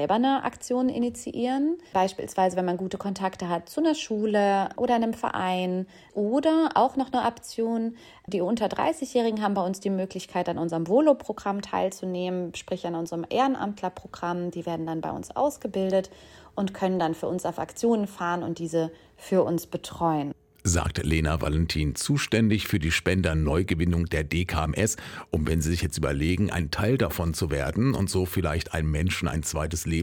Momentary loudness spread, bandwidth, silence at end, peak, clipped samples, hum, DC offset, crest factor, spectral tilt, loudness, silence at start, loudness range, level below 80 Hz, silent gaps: 8 LU; 18.5 kHz; 0 s; -8 dBFS; under 0.1%; none; under 0.1%; 18 dB; -5.5 dB/octave; -27 LUFS; 0 s; 4 LU; -40 dBFS; none